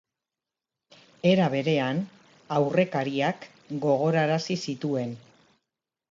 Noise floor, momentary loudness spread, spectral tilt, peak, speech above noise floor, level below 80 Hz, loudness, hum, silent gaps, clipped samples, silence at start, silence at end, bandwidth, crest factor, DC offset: -89 dBFS; 13 LU; -6.5 dB/octave; -8 dBFS; 64 dB; -74 dBFS; -26 LUFS; none; none; under 0.1%; 1.25 s; 0.9 s; 7.6 kHz; 18 dB; under 0.1%